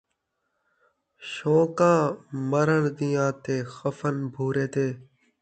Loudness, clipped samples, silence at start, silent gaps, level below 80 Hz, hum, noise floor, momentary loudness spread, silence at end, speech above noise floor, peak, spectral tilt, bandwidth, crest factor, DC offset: -25 LUFS; under 0.1%; 1.2 s; none; -66 dBFS; none; -78 dBFS; 11 LU; 0.4 s; 53 dB; -8 dBFS; -7 dB/octave; 9 kHz; 18 dB; under 0.1%